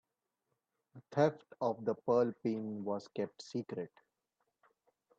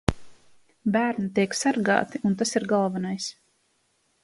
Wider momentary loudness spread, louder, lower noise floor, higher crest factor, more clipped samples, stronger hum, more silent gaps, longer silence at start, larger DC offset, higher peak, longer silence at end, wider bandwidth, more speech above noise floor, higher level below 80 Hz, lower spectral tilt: first, 11 LU vs 8 LU; second, -37 LUFS vs -25 LUFS; first, -86 dBFS vs -69 dBFS; about the same, 22 dB vs 24 dB; neither; neither; neither; first, 0.95 s vs 0.1 s; neither; second, -16 dBFS vs -2 dBFS; first, 1.3 s vs 0.9 s; second, 8 kHz vs 11.5 kHz; first, 51 dB vs 45 dB; second, -82 dBFS vs -48 dBFS; first, -7.5 dB/octave vs -5 dB/octave